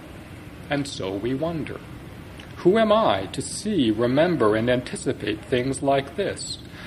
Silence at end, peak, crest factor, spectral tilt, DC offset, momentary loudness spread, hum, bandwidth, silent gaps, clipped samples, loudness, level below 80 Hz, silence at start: 0 s; -6 dBFS; 18 dB; -5.5 dB/octave; under 0.1%; 20 LU; none; 14 kHz; none; under 0.1%; -23 LUFS; -48 dBFS; 0 s